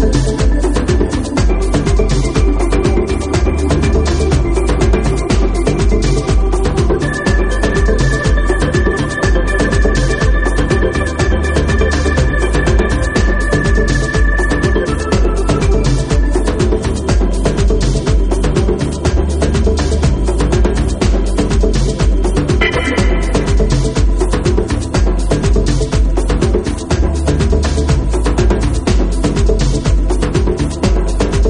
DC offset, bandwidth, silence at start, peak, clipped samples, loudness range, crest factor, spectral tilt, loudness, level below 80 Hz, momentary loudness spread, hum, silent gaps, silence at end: under 0.1%; 11 kHz; 0 s; 0 dBFS; under 0.1%; 1 LU; 12 dB; -6 dB/octave; -14 LUFS; -14 dBFS; 2 LU; none; none; 0 s